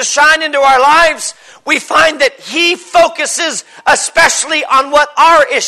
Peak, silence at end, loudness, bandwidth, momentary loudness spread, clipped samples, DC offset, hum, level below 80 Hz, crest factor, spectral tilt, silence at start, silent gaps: 0 dBFS; 0 s; -9 LUFS; 12.5 kHz; 8 LU; under 0.1%; under 0.1%; none; -44 dBFS; 10 dB; 0 dB/octave; 0 s; none